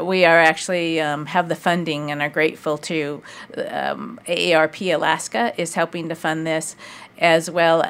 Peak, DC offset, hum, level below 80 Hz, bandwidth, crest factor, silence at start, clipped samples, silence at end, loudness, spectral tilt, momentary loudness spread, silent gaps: 0 dBFS; under 0.1%; none; -68 dBFS; 16 kHz; 20 dB; 0 s; under 0.1%; 0 s; -20 LUFS; -4 dB/octave; 12 LU; none